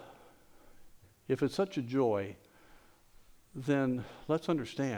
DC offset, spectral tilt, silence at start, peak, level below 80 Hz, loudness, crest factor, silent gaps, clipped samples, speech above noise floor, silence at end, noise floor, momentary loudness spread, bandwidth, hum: under 0.1%; -7 dB/octave; 0 s; -18 dBFS; -66 dBFS; -34 LUFS; 18 dB; none; under 0.1%; 27 dB; 0 s; -60 dBFS; 19 LU; over 20 kHz; none